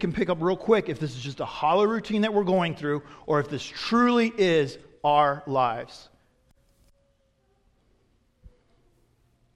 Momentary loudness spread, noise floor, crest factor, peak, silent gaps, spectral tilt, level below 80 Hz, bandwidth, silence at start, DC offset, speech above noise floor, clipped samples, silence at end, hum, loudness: 11 LU; -67 dBFS; 18 dB; -8 dBFS; none; -6 dB/octave; -58 dBFS; 11 kHz; 0 s; under 0.1%; 43 dB; under 0.1%; 1.1 s; none; -25 LUFS